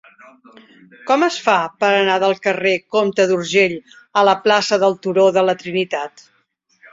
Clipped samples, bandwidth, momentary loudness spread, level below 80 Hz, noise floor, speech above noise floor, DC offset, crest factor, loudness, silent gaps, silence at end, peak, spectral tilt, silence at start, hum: under 0.1%; 7.8 kHz; 7 LU; -66 dBFS; -63 dBFS; 46 dB; under 0.1%; 18 dB; -16 LUFS; none; 0.85 s; 0 dBFS; -4 dB/octave; 1.05 s; none